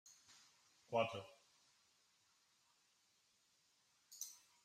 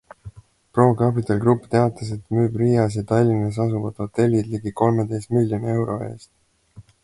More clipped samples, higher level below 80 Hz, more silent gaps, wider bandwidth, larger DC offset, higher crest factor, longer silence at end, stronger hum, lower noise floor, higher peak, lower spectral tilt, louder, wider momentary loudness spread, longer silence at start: neither; second, under -90 dBFS vs -50 dBFS; neither; first, 15.5 kHz vs 11.5 kHz; neither; first, 26 dB vs 20 dB; about the same, 0.3 s vs 0.2 s; neither; first, -79 dBFS vs -48 dBFS; second, -26 dBFS vs -2 dBFS; second, -3 dB/octave vs -8.5 dB/octave; second, -45 LUFS vs -21 LUFS; first, 24 LU vs 8 LU; second, 0.05 s vs 0.25 s